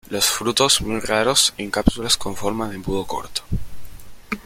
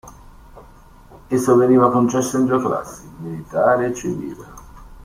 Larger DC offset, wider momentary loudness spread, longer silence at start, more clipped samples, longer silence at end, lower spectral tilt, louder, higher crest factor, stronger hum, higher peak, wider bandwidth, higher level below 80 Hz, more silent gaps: neither; second, 11 LU vs 19 LU; about the same, 0.05 s vs 0.05 s; neither; about the same, 0.05 s vs 0 s; second, -2.5 dB/octave vs -6.5 dB/octave; about the same, -20 LUFS vs -18 LUFS; about the same, 22 dB vs 18 dB; neither; about the same, 0 dBFS vs -2 dBFS; about the same, 16.5 kHz vs 15.5 kHz; first, -34 dBFS vs -48 dBFS; neither